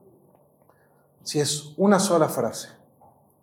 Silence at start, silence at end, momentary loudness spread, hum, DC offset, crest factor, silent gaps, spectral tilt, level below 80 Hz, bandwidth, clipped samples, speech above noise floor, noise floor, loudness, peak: 1.25 s; 0.75 s; 18 LU; none; under 0.1%; 22 dB; none; -4.5 dB/octave; -74 dBFS; 17.5 kHz; under 0.1%; 38 dB; -60 dBFS; -23 LUFS; -4 dBFS